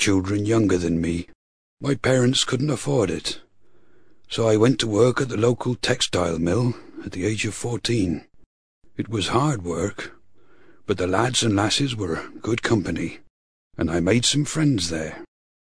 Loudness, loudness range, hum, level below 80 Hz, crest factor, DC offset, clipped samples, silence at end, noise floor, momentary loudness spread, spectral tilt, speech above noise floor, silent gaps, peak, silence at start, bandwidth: -22 LUFS; 4 LU; none; -48 dBFS; 20 dB; 0.5%; under 0.1%; 0.5 s; -60 dBFS; 13 LU; -5 dB/octave; 38 dB; 1.35-1.77 s, 8.46-8.81 s, 13.30-13.71 s; -2 dBFS; 0 s; 11 kHz